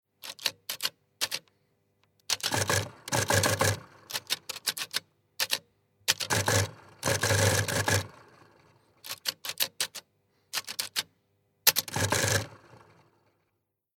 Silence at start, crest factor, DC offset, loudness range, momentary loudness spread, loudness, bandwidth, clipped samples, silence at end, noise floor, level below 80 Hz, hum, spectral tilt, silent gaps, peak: 0.25 s; 30 dB; under 0.1%; 4 LU; 12 LU; -29 LUFS; 19.5 kHz; under 0.1%; 1.4 s; -80 dBFS; -62 dBFS; none; -2.5 dB/octave; none; -2 dBFS